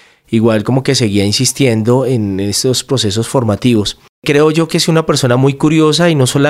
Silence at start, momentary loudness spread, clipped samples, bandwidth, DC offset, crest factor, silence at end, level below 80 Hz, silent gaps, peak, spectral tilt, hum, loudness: 0.3 s; 5 LU; under 0.1%; 15.5 kHz; under 0.1%; 12 dB; 0 s; -44 dBFS; 4.09-4.22 s; 0 dBFS; -5 dB/octave; none; -12 LUFS